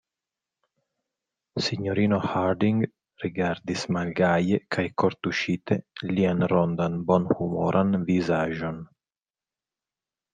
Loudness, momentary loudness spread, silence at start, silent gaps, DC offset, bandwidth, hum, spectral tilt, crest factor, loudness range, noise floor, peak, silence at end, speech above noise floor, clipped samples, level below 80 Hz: -25 LUFS; 7 LU; 1.55 s; none; under 0.1%; 9.2 kHz; none; -7 dB/octave; 20 dB; 3 LU; under -90 dBFS; -6 dBFS; 1.5 s; over 65 dB; under 0.1%; -62 dBFS